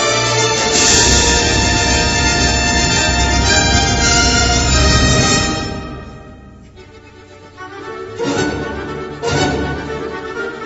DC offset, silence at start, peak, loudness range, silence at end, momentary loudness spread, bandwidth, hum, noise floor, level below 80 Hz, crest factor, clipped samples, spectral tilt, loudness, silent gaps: under 0.1%; 0 s; 0 dBFS; 13 LU; 0 s; 15 LU; 11 kHz; none; -39 dBFS; -24 dBFS; 16 dB; under 0.1%; -3 dB/octave; -13 LUFS; none